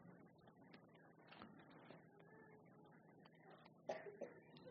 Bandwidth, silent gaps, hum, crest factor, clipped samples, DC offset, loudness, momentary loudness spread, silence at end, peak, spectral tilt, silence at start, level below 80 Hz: 5.2 kHz; none; none; 28 dB; under 0.1%; under 0.1%; -61 LUFS; 15 LU; 0 s; -32 dBFS; -4.5 dB/octave; 0 s; under -90 dBFS